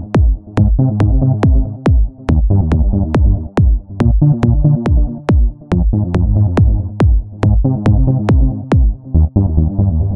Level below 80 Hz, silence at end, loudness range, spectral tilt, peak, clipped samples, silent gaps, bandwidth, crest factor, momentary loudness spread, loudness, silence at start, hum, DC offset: -14 dBFS; 0 s; 0 LU; -10 dB/octave; 0 dBFS; under 0.1%; none; 5.6 kHz; 10 dB; 3 LU; -14 LUFS; 0 s; none; 0.5%